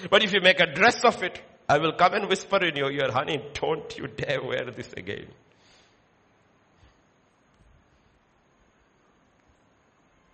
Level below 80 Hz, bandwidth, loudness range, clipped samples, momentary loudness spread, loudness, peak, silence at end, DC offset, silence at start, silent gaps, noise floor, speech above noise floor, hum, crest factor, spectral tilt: -62 dBFS; 8.4 kHz; 20 LU; under 0.1%; 17 LU; -24 LUFS; -4 dBFS; 5.1 s; under 0.1%; 0 s; none; -64 dBFS; 39 dB; none; 24 dB; -4 dB/octave